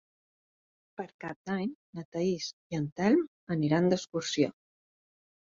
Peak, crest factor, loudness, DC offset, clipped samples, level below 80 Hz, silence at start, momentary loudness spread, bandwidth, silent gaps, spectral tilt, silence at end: -12 dBFS; 20 dB; -31 LUFS; under 0.1%; under 0.1%; -70 dBFS; 1 s; 15 LU; 7.6 kHz; 1.14-1.19 s, 1.36-1.45 s, 1.75-1.93 s, 2.05-2.12 s, 2.53-2.70 s, 2.92-2.96 s, 3.28-3.47 s; -6 dB/octave; 1 s